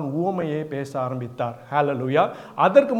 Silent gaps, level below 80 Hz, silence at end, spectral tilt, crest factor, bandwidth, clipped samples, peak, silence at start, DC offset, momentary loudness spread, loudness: none; -70 dBFS; 0 s; -7.5 dB/octave; 20 dB; 9.8 kHz; under 0.1%; -2 dBFS; 0 s; under 0.1%; 11 LU; -23 LUFS